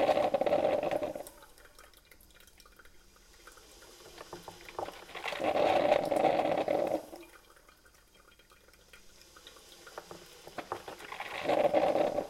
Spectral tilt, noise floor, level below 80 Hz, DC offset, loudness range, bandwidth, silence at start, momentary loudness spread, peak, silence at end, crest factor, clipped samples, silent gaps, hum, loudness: -4.5 dB/octave; -61 dBFS; -64 dBFS; under 0.1%; 21 LU; 16 kHz; 0 s; 24 LU; -12 dBFS; 0 s; 22 dB; under 0.1%; none; none; -31 LUFS